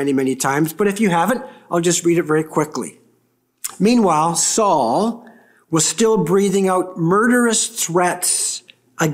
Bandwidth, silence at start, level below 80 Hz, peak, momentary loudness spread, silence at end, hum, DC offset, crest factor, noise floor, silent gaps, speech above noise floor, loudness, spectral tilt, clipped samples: 16 kHz; 0 s; -60 dBFS; -4 dBFS; 9 LU; 0 s; none; under 0.1%; 14 dB; -63 dBFS; none; 46 dB; -17 LUFS; -4 dB/octave; under 0.1%